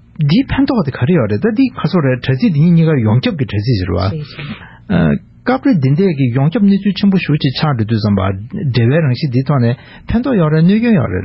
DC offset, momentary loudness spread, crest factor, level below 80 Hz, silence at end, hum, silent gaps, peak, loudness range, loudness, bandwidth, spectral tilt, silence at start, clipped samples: under 0.1%; 7 LU; 12 dB; -34 dBFS; 0 s; none; none; -2 dBFS; 2 LU; -13 LUFS; 5.8 kHz; -11.5 dB/octave; 0.2 s; under 0.1%